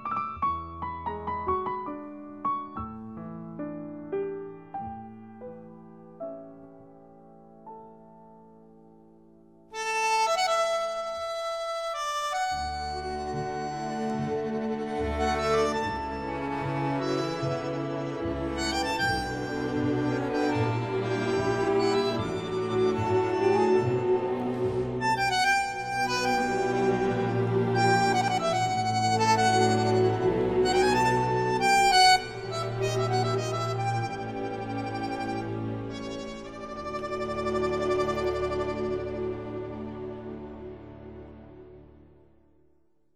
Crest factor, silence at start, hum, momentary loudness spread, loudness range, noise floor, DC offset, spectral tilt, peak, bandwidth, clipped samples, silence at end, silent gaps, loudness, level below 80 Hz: 20 dB; 0 s; none; 16 LU; 15 LU; -69 dBFS; under 0.1%; -5 dB/octave; -8 dBFS; 15.5 kHz; under 0.1%; 1.3 s; none; -27 LUFS; -50 dBFS